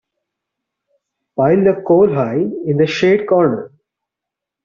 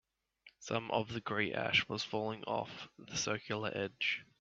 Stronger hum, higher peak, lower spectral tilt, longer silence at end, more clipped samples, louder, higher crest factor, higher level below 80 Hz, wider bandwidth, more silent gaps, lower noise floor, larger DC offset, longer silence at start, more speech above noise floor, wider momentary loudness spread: neither; first, -2 dBFS vs -18 dBFS; first, -6 dB/octave vs -2 dB/octave; first, 1 s vs 0.15 s; neither; first, -14 LUFS vs -37 LUFS; second, 16 dB vs 22 dB; first, -54 dBFS vs -72 dBFS; about the same, 7.2 kHz vs 7.8 kHz; neither; first, -83 dBFS vs -66 dBFS; neither; first, 1.35 s vs 0.45 s; first, 70 dB vs 28 dB; second, 6 LU vs 9 LU